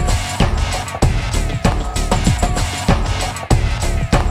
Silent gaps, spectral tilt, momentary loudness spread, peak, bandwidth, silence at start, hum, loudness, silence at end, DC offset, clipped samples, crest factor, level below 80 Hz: none; -5 dB/octave; 4 LU; 0 dBFS; 14.5 kHz; 0 s; none; -18 LUFS; 0 s; under 0.1%; under 0.1%; 16 dB; -20 dBFS